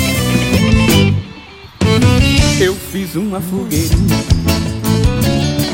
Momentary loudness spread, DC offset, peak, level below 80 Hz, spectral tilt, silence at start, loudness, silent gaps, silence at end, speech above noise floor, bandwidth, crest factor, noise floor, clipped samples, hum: 9 LU; under 0.1%; 0 dBFS; -22 dBFS; -5 dB/octave; 0 s; -13 LUFS; none; 0 s; 19 dB; 16.5 kHz; 12 dB; -34 dBFS; under 0.1%; none